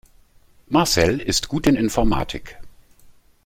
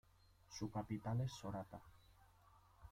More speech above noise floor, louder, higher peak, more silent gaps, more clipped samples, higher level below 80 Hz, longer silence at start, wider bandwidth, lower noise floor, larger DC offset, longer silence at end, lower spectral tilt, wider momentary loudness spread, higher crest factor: first, 33 dB vs 24 dB; first, -20 LUFS vs -47 LUFS; first, -2 dBFS vs -32 dBFS; neither; neither; first, -34 dBFS vs -68 dBFS; first, 0.7 s vs 0.5 s; about the same, 16.5 kHz vs 15.5 kHz; second, -53 dBFS vs -70 dBFS; neither; first, 0.35 s vs 0 s; second, -4.5 dB/octave vs -6.5 dB/octave; second, 8 LU vs 15 LU; about the same, 20 dB vs 18 dB